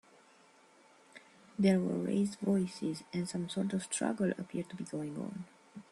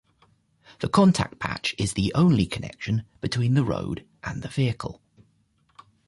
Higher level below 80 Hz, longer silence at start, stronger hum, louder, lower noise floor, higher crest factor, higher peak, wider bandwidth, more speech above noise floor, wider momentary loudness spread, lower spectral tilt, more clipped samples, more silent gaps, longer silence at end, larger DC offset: second, -74 dBFS vs -48 dBFS; first, 1.15 s vs 0.8 s; neither; second, -35 LUFS vs -25 LUFS; about the same, -63 dBFS vs -66 dBFS; about the same, 20 dB vs 18 dB; second, -16 dBFS vs -8 dBFS; about the same, 12 kHz vs 11.5 kHz; second, 29 dB vs 42 dB; about the same, 13 LU vs 14 LU; about the same, -6 dB/octave vs -6 dB/octave; neither; neither; second, 0.1 s vs 1.15 s; neither